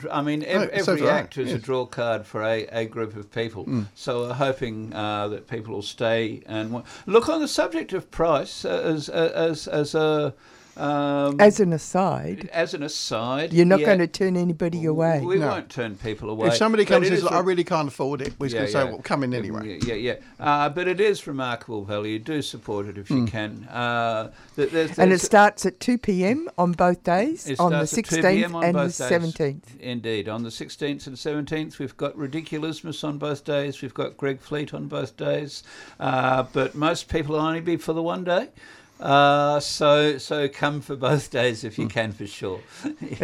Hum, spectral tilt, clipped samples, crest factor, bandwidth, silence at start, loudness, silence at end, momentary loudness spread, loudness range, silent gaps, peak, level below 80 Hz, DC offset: none; -5.5 dB/octave; under 0.1%; 20 dB; 15 kHz; 0 s; -24 LUFS; 0 s; 12 LU; 8 LU; none; -4 dBFS; -54 dBFS; under 0.1%